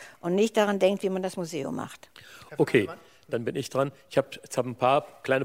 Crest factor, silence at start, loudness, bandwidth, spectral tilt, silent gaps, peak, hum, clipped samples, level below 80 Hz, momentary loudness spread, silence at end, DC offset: 20 dB; 0 s; -27 LUFS; 16 kHz; -5.5 dB/octave; none; -8 dBFS; none; under 0.1%; -70 dBFS; 16 LU; 0 s; under 0.1%